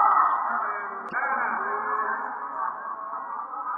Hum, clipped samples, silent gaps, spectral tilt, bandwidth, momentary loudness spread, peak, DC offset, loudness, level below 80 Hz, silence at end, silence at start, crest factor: none; under 0.1%; none; -2 dB/octave; 5.4 kHz; 11 LU; -8 dBFS; under 0.1%; -27 LUFS; under -90 dBFS; 0 s; 0 s; 18 dB